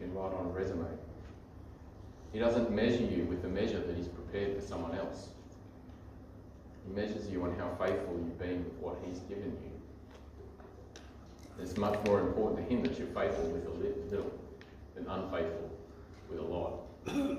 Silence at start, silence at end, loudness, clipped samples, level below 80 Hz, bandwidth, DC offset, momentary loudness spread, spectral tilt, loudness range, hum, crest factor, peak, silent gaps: 0 s; 0 s; -36 LUFS; under 0.1%; -54 dBFS; 15 kHz; under 0.1%; 21 LU; -7 dB/octave; 7 LU; none; 20 dB; -16 dBFS; none